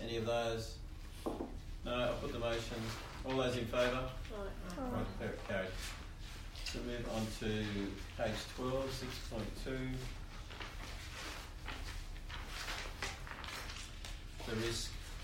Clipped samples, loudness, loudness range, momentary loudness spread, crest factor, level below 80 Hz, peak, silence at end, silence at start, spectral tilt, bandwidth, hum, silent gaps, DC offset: under 0.1%; -42 LUFS; 6 LU; 11 LU; 18 dB; -48 dBFS; -22 dBFS; 0 s; 0 s; -4.5 dB/octave; 16 kHz; none; none; under 0.1%